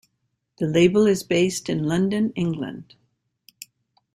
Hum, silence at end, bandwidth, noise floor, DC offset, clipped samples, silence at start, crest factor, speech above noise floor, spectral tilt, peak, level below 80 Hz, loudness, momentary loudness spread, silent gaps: none; 1.3 s; 16 kHz; -75 dBFS; under 0.1%; under 0.1%; 0.6 s; 20 dB; 54 dB; -6 dB/octave; -4 dBFS; -58 dBFS; -21 LUFS; 19 LU; none